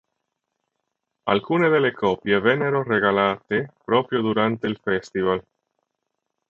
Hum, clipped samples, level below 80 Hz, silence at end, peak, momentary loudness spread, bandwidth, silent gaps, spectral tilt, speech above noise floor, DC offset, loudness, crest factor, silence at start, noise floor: 50 Hz at -45 dBFS; under 0.1%; -58 dBFS; 1.1 s; -2 dBFS; 7 LU; 7.4 kHz; none; -7 dB/octave; 58 dB; under 0.1%; -22 LUFS; 22 dB; 1.25 s; -79 dBFS